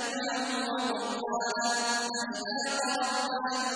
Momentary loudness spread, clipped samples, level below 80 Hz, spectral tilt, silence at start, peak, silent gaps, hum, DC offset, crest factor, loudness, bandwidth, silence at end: 4 LU; under 0.1%; -76 dBFS; -1 dB/octave; 0 s; -16 dBFS; none; none; under 0.1%; 14 dB; -30 LUFS; 10.5 kHz; 0 s